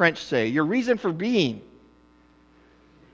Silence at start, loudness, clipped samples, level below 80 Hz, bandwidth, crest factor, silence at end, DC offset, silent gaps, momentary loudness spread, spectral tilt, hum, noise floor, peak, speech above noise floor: 0 s; -24 LUFS; under 0.1%; -62 dBFS; 8 kHz; 20 dB; 1.5 s; under 0.1%; none; 4 LU; -5.5 dB/octave; none; -57 dBFS; -6 dBFS; 34 dB